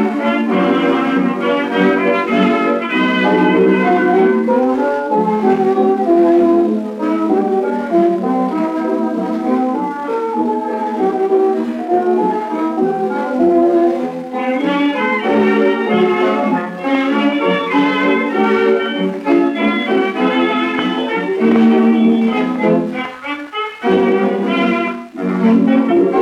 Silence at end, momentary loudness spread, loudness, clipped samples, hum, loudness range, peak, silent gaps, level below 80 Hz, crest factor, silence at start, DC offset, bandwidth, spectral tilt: 0 s; 7 LU; -15 LUFS; under 0.1%; none; 3 LU; 0 dBFS; none; -60 dBFS; 14 dB; 0 s; under 0.1%; 9.6 kHz; -7 dB/octave